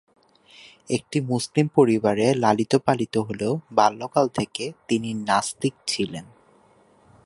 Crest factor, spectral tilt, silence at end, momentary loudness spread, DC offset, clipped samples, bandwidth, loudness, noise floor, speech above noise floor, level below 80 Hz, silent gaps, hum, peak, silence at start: 22 dB; -5.5 dB/octave; 1 s; 9 LU; under 0.1%; under 0.1%; 11.5 kHz; -23 LUFS; -57 dBFS; 35 dB; -60 dBFS; none; none; -2 dBFS; 0.9 s